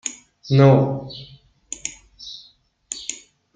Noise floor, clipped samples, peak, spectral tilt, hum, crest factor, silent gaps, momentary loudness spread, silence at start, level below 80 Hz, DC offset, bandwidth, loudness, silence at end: -55 dBFS; under 0.1%; -2 dBFS; -6 dB/octave; none; 20 dB; none; 25 LU; 0.05 s; -58 dBFS; under 0.1%; 9.4 kHz; -20 LUFS; 0.4 s